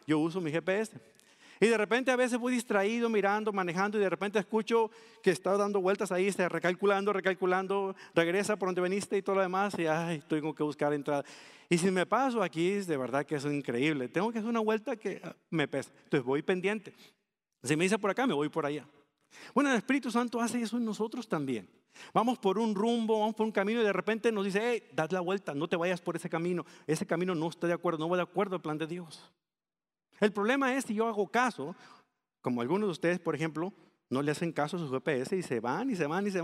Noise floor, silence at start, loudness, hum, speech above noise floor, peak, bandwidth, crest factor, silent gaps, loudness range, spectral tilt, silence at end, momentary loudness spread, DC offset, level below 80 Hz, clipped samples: under -90 dBFS; 0.1 s; -31 LUFS; none; over 59 dB; -10 dBFS; 14.5 kHz; 20 dB; none; 3 LU; -5.5 dB/octave; 0 s; 7 LU; under 0.1%; -82 dBFS; under 0.1%